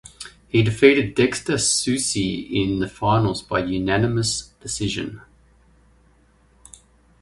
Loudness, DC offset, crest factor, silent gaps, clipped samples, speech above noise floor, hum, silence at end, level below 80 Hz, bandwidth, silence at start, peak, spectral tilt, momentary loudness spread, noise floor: -21 LUFS; under 0.1%; 22 dB; none; under 0.1%; 36 dB; none; 2 s; -46 dBFS; 11.5 kHz; 0.2 s; 0 dBFS; -4.5 dB/octave; 12 LU; -57 dBFS